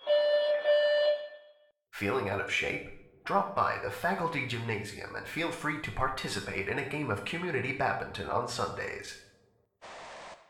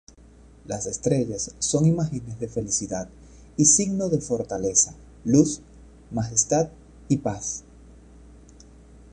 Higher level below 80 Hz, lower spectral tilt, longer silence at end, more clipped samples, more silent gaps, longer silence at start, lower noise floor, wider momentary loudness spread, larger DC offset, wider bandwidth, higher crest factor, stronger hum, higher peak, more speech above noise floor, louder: second, -56 dBFS vs -50 dBFS; about the same, -4.5 dB/octave vs -4.5 dB/octave; second, 0.15 s vs 0.9 s; neither; neither; second, 0 s vs 0.65 s; first, -68 dBFS vs -50 dBFS; first, 18 LU vs 14 LU; neither; first, 16.5 kHz vs 10.5 kHz; about the same, 18 dB vs 22 dB; neither; second, -14 dBFS vs -4 dBFS; first, 35 dB vs 26 dB; second, -31 LUFS vs -23 LUFS